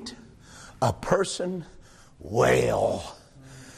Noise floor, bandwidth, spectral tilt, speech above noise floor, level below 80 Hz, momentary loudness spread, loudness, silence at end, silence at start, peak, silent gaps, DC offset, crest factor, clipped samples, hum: -48 dBFS; 14 kHz; -5 dB/octave; 23 dB; -50 dBFS; 25 LU; -25 LUFS; 0 s; 0 s; -10 dBFS; none; under 0.1%; 18 dB; under 0.1%; none